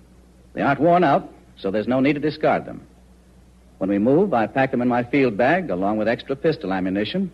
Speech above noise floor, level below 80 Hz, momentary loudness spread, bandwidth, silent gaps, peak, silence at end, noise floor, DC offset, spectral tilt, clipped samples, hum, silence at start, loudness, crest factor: 30 dB; -52 dBFS; 8 LU; 8.4 kHz; none; -6 dBFS; 0.05 s; -50 dBFS; under 0.1%; -8 dB/octave; under 0.1%; none; 0.55 s; -21 LUFS; 14 dB